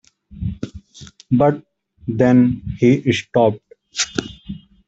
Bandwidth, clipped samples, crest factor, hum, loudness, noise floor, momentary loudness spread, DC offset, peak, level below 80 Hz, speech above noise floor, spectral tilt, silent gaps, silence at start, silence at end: 8 kHz; under 0.1%; 16 dB; none; -18 LUFS; -43 dBFS; 19 LU; under 0.1%; -2 dBFS; -44 dBFS; 27 dB; -6 dB/octave; none; 0.3 s; 0.3 s